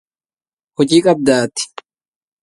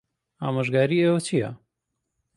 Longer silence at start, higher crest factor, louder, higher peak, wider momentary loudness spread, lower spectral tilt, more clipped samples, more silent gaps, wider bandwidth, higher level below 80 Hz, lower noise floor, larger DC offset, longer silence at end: first, 0.8 s vs 0.4 s; about the same, 18 dB vs 18 dB; first, -14 LUFS vs -23 LUFS; first, 0 dBFS vs -8 dBFS; first, 14 LU vs 11 LU; second, -4.5 dB/octave vs -6.5 dB/octave; neither; neither; about the same, 11.5 kHz vs 11.5 kHz; first, -58 dBFS vs -66 dBFS; first, under -90 dBFS vs -81 dBFS; neither; about the same, 0.75 s vs 0.8 s